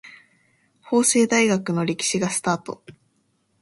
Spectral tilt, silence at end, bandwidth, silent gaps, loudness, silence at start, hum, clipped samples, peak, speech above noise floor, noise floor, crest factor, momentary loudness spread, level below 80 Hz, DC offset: -3.5 dB/octave; 0.7 s; 11.5 kHz; none; -21 LUFS; 0.05 s; none; under 0.1%; -4 dBFS; 46 dB; -67 dBFS; 18 dB; 10 LU; -64 dBFS; under 0.1%